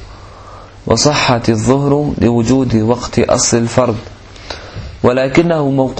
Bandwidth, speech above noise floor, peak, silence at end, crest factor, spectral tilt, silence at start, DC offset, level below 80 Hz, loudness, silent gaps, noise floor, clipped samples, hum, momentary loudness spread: 8.8 kHz; 22 dB; 0 dBFS; 0 s; 14 dB; -5 dB/octave; 0 s; under 0.1%; -36 dBFS; -13 LUFS; none; -34 dBFS; under 0.1%; none; 16 LU